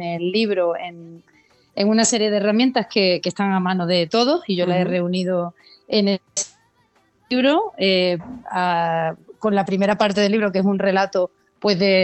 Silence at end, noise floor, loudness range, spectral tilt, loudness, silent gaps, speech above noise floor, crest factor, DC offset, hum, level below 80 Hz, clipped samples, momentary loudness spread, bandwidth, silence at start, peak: 0 s; -61 dBFS; 3 LU; -4.5 dB/octave; -20 LUFS; none; 42 dB; 16 dB; under 0.1%; none; -64 dBFS; under 0.1%; 8 LU; 8.6 kHz; 0 s; -4 dBFS